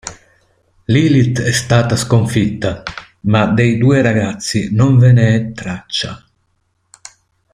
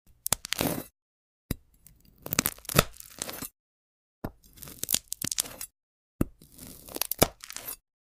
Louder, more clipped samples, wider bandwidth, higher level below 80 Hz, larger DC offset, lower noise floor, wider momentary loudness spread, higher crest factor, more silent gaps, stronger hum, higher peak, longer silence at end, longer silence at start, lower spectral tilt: first, -14 LUFS vs -30 LUFS; neither; second, 12.5 kHz vs 16 kHz; first, -42 dBFS vs -48 dBFS; neither; first, -63 dBFS vs -59 dBFS; second, 14 LU vs 19 LU; second, 14 dB vs 30 dB; second, none vs 1.02-1.49 s, 3.59-4.22 s, 5.83-6.19 s; neither; first, 0 dBFS vs -4 dBFS; first, 1.35 s vs 0.3 s; second, 0.05 s vs 0.3 s; first, -6 dB/octave vs -3 dB/octave